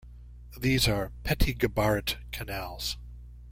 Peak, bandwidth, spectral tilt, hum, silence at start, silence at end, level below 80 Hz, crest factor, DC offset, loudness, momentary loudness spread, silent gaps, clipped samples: -12 dBFS; 16.5 kHz; -4.5 dB/octave; 60 Hz at -40 dBFS; 0.05 s; 0 s; -38 dBFS; 18 dB; under 0.1%; -29 LUFS; 16 LU; none; under 0.1%